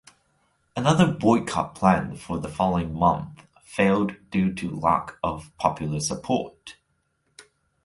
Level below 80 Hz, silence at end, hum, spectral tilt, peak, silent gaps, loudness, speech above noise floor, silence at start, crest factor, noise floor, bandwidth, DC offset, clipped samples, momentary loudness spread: -48 dBFS; 0.45 s; none; -6 dB/octave; -4 dBFS; none; -24 LUFS; 48 dB; 0.75 s; 20 dB; -72 dBFS; 11.5 kHz; under 0.1%; under 0.1%; 12 LU